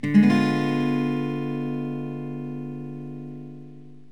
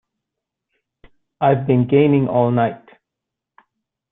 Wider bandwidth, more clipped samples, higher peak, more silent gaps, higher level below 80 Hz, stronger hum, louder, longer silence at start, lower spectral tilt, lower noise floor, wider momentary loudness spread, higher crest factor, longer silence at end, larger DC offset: first, 10.5 kHz vs 3.9 kHz; neither; second, -6 dBFS vs -2 dBFS; neither; second, -72 dBFS vs -56 dBFS; neither; second, -25 LUFS vs -17 LUFS; second, 0.05 s vs 1.4 s; second, -7.5 dB/octave vs -12.5 dB/octave; second, -45 dBFS vs -83 dBFS; first, 20 LU vs 6 LU; about the same, 18 dB vs 18 dB; second, 0.15 s vs 1.35 s; first, 0.5% vs under 0.1%